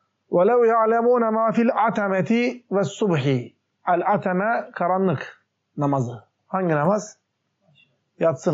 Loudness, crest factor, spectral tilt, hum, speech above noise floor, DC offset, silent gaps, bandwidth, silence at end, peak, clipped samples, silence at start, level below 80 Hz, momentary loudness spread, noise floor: -21 LUFS; 12 dB; -6.5 dB/octave; none; 47 dB; under 0.1%; none; 8 kHz; 0 s; -8 dBFS; under 0.1%; 0.3 s; -74 dBFS; 12 LU; -68 dBFS